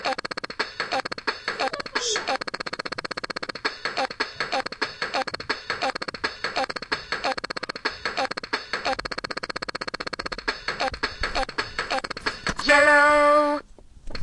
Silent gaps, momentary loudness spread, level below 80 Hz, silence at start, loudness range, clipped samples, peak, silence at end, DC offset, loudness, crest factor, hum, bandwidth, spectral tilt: none; 12 LU; -46 dBFS; 0 s; 8 LU; under 0.1%; -4 dBFS; 0 s; under 0.1%; -25 LUFS; 22 dB; none; 11.5 kHz; -2 dB/octave